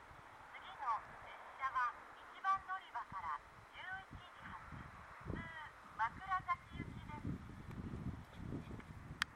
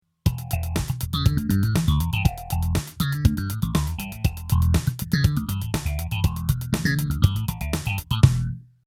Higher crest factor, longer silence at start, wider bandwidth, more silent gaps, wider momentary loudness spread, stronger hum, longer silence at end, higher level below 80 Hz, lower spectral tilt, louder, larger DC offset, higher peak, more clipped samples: first, 30 dB vs 22 dB; second, 0 s vs 0.25 s; about the same, 16 kHz vs 17 kHz; neither; first, 14 LU vs 7 LU; neither; second, 0 s vs 0.25 s; second, -62 dBFS vs -30 dBFS; about the same, -5 dB/octave vs -5.5 dB/octave; second, -46 LUFS vs -24 LUFS; neither; second, -16 dBFS vs 0 dBFS; neither